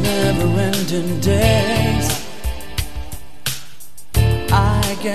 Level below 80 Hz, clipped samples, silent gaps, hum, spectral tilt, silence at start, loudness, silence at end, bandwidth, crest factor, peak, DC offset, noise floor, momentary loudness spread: -28 dBFS; under 0.1%; none; none; -5 dB/octave; 0 s; -18 LUFS; 0 s; 14 kHz; 18 dB; 0 dBFS; 5%; -43 dBFS; 14 LU